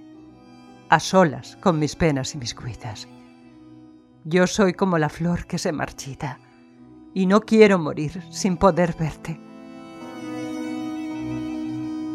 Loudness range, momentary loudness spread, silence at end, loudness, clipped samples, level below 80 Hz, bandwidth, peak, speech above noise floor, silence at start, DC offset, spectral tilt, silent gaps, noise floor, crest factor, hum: 5 LU; 18 LU; 0 s; -22 LUFS; under 0.1%; -48 dBFS; 13 kHz; -2 dBFS; 28 dB; 0 s; under 0.1%; -5.5 dB/octave; none; -48 dBFS; 22 dB; none